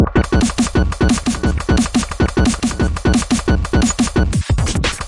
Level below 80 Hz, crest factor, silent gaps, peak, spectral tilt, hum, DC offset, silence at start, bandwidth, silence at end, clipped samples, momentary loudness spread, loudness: -22 dBFS; 14 dB; none; 0 dBFS; -5 dB/octave; none; under 0.1%; 0 s; 11.5 kHz; 0 s; under 0.1%; 3 LU; -16 LUFS